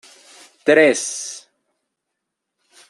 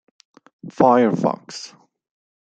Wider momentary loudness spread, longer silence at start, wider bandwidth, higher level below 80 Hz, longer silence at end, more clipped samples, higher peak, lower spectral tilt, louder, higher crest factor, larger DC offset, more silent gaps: second, 18 LU vs 23 LU; about the same, 0.65 s vs 0.65 s; first, 12.5 kHz vs 9 kHz; second, -76 dBFS vs -64 dBFS; first, 1.5 s vs 0.85 s; neither; about the same, -2 dBFS vs -2 dBFS; second, -2.5 dB/octave vs -6.5 dB/octave; about the same, -17 LUFS vs -17 LUFS; about the same, 20 dB vs 20 dB; neither; neither